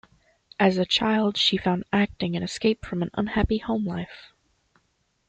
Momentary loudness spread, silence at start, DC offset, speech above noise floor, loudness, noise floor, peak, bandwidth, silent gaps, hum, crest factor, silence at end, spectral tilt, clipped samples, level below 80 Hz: 9 LU; 0.6 s; under 0.1%; 46 dB; -24 LUFS; -71 dBFS; -6 dBFS; 9 kHz; none; none; 20 dB; 1.05 s; -5.5 dB/octave; under 0.1%; -44 dBFS